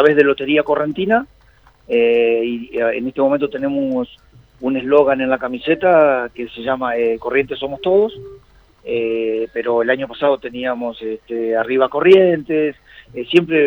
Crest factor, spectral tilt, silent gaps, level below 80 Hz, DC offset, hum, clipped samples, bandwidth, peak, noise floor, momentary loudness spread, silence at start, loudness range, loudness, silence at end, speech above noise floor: 16 dB; -7.5 dB/octave; none; -52 dBFS; under 0.1%; none; under 0.1%; 6 kHz; 0 dBFS; -50 dBFS; 12 LU; 0 s; 3 LU; -17 LUFS; 0 s; 34 dB